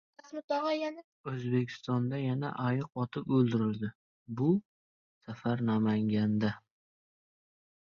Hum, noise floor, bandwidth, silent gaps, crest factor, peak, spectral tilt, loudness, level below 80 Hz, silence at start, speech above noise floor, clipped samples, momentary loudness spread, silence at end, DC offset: none; under -90 dBFS; 6.8 kHz; 0.44-0.48 s, 1.04-1.24 s, 3.95-4.26 s, 4.65-5.21 s; 18 dB; -16 dBFS; -8.5 dB/octave; -32 LUFS; -70 dBFS; 0.25 s; over 59 dB; under 0.1%; 12 LU; 1.35 s; under 0.1%